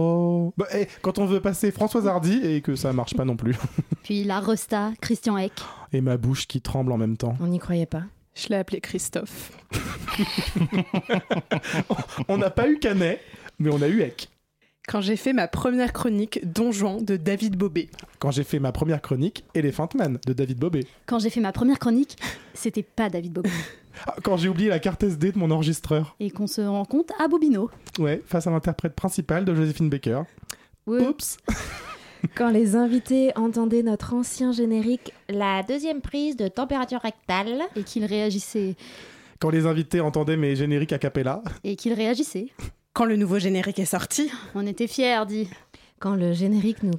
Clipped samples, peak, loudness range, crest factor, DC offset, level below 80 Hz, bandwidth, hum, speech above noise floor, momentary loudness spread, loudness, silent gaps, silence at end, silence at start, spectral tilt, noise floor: under 0.1%; -10 dBFS; 3 LU; 14 dB; under 0.1%; -48 dBFS; 16.5 kHz; none; 43 dB; 9 LU; -25 LUFS; none; 0 s; 0 s; -6 dB/octave; -67 dBFS